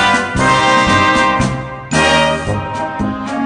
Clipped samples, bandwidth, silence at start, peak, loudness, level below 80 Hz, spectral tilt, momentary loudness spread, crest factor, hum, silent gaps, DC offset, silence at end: under 0.1%; 10 kHz; 0 s; 0 dBFS; -13 LUFS; -32 dBFS; -4 dB/octave; 9 LU; 12 dB; none; none; under 0.1%; 0 s